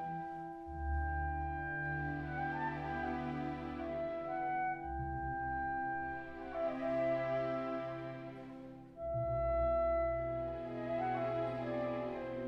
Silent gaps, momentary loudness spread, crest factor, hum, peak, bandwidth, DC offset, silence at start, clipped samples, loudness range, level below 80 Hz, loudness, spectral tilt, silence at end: none; 10 LU; 14 dB; none; -26 dBFS; 6.2 kHz; under 0.1%; 0 s; under 0.1%; 3 LU; -50 dBFS; -39 LUFS; -9 dB/octave; 0 s